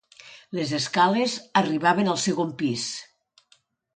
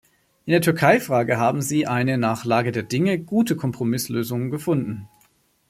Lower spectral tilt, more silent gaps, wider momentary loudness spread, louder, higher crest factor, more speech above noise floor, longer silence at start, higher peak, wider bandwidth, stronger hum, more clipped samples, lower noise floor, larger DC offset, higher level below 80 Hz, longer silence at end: second, -4 dB/octave vs -6 dB/octave; neither; about the same, 10 LU vs 8 LU; second, -24 LUFS vs -21 LUFS; about the same, 20 dB vs 20 dB; about the same, 40 dB vs 41 dB; second, 0.25 s vs 0.45 s; second, -6 dBFS vs -2 dBFS; second, 9.6 kHz vs 16 kHz; neither; neither; about the same, -63 dBFS vs -62 dBFS; neither; second, -70 dBFS vs -60 dBFS; first, 0.9 s vs 0.65 s